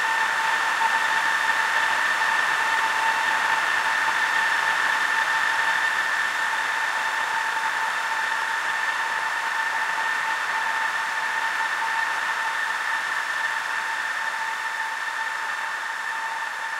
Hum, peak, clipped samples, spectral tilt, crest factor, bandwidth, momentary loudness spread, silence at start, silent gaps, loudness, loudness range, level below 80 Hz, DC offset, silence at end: none; -8 dBFS; under 0.1%; 1 dB/octave; 16 dB; 16 kHz; 6 LU; 0 s; none; -23 LUFS; 4 LU; -70 dBFS; under 0.1%; 0 s